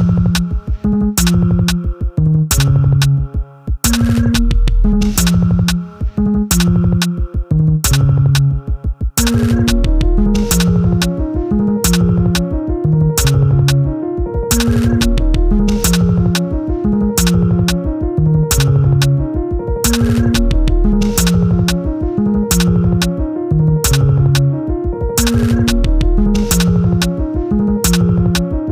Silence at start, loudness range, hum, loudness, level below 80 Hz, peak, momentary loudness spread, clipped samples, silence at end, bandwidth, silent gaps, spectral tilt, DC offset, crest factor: 0 s; 1 LU; none; -14 LUFS; -18 dBFS; -2 dBFS; 6 LU; under 0.1%; 0 s; over 20 kHz; none; -5.5 dB/octave; under 0.1%; 10 dB